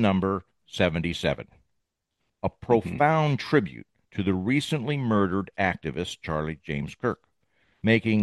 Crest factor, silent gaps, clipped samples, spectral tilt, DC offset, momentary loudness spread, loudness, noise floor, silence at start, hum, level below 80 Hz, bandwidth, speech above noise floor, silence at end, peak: 20 dB; none; under 0.1%; -6.5 dB/octave; under 0.1%; 11 LU; -26 LUFS; -79 dBFS; 0 s; none; -54 dBFS; 12.5 kHz; 53 dB; 0 s; -6 dBFS